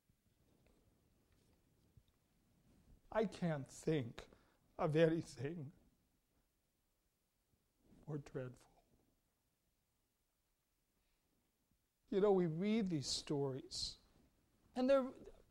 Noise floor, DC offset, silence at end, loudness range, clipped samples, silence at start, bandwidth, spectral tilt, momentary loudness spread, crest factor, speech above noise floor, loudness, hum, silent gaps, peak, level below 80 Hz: -85 dBFS; under 0.1%; 0.2 s; 15 LU; under 0.1%; 2.9 s; 15 kHz; -5.5 dB/octave; 15 LU; 22 dB; 46 dB; -40 LUFS; none; none; -20 dBFS; -70 dBFS